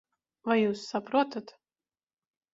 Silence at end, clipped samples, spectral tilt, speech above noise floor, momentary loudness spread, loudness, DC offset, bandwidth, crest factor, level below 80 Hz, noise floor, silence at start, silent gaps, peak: 1.1 s; under 0.1%; -5.5 dB/octave; over 61 dB; 11 LU; -29 LUFS; under 0.1%; 7.8 kHz; 20 dB; -76 dBFS; under -90 dBFS; 0.45 s; none; -12 dBFS